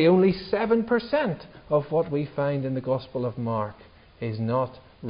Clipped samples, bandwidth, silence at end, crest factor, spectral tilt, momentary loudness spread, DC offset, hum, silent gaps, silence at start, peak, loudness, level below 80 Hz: under 0.1%; 5.4 kHz; 0 s; 16 dB; -11.5 dB/octave; 10 LU; under 0.1%; none; none; 0 s; -10 dBFS; -26 LUFS; -56 dBFS